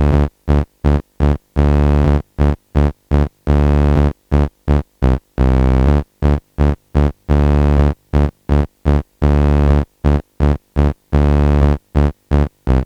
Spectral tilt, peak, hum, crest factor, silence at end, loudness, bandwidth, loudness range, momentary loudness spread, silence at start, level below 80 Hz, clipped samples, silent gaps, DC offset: -9 dB/octave; 0 dBFS; none; 14 dB; 0 s; -16 LUFS; 6 kHz; 1 LU; 5 LU; 0 s; -16 dBFS; under 0.1%; none; under 0.1%